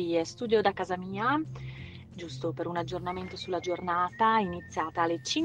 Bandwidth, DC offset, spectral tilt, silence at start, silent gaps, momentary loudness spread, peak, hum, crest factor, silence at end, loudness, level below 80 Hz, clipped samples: 10 kHz; under 0.1%; -5 dB/octave; 0 s; none; 16 LU; -10 dBFS; none; 20 dB; 0 s; -30 LUFS; -60 dBFS; under 0.1%